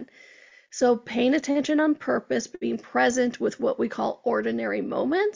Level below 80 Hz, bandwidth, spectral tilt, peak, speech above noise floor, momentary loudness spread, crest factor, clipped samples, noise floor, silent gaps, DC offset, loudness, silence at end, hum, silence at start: -66 dBFS; 7.6 kHz; -4 dB/octave; -10 dBFS; 28 dB; 6 LU; 16 dB; under 0.1%; -53 dBFS; none; under 0.1%; -25 LUFS; 0 s; none; 0 s